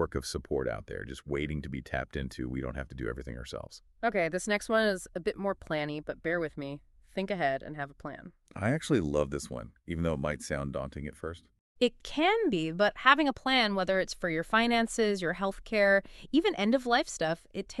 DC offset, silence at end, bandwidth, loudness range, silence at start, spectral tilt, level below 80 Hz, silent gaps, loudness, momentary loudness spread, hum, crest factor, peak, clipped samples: under 0.1%; 0 s; 13 kHz; 8 LU; 0 s; -4.5 dB/octave; -50 dBFS; 11.60-11.75 s; -30 LUFS; 15 LU; none; 26 dB; -6 dBFS; under 0.1%